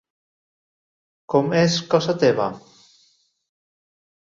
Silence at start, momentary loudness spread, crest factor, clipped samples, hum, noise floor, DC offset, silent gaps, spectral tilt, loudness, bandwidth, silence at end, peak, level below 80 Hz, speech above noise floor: 1.3 s; 8 LU; 20 dB; under 0.1%; none; -62 dBFS; under 0.1%; none; -5.5 dB/octave; -20 LUFS; 7.6 kHz; 1.75 s; -4 dBFS; -62 dBFS; 43 dB